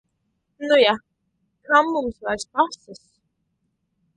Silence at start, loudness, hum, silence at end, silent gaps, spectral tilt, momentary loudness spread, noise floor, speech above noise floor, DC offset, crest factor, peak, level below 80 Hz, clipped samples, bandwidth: 0.6 s; -20 LUFS; none; 1.2 s; none; -3 dB/octave; 12 LU; -73 dBFS; 53 dB; under 0.1%; 22 dB; -2 dBFS; -58 dBFS; under 0.1%; 11 kHz